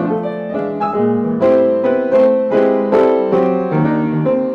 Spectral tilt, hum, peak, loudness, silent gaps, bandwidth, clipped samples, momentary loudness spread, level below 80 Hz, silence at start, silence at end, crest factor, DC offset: -9.5 dB/octave; none; -2 dBFS; -15 LUFS; none; 5.4 kHz; under 0.1%; 7 LU; -54 dBFS; 0 s; 0 s; 12 dB; under 0.1%